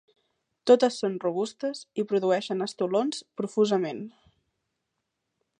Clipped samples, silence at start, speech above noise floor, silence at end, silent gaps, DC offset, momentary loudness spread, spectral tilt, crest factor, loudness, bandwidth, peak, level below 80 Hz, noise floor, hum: under 0.1%; 0.65 s; 56 dB; 1.5 s; none; under 0.1%; 13 LU; -5 dB/octave; 22 dB; -27 LUFS; 10 kHz; -6 dBFS; -80 dBFS; -82 dBFS; none